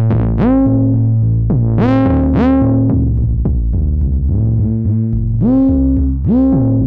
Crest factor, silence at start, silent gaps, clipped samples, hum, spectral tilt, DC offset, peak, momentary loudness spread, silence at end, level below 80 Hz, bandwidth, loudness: 10 dB; 0 s; none; under 0.1%; none; -12 dB/octave; under 0.1%; -2 dBFS; 4 LU; 0 s; -20 dBFS; 4.1 kHz; -13 LUFS